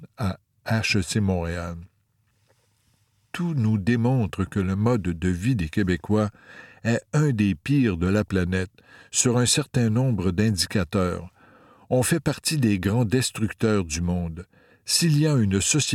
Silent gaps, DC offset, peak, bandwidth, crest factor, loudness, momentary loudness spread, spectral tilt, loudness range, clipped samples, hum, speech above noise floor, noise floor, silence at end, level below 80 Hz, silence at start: none; under 0.1%; -6 dBFS; 16.5 kHz; 18 dB; -23 LUFS; 10 LU; -5 dB/octave; 5 LU; under 0.1%; none; 45 dB; -68 dBFS; 0 s; -46 dBFS; 0 s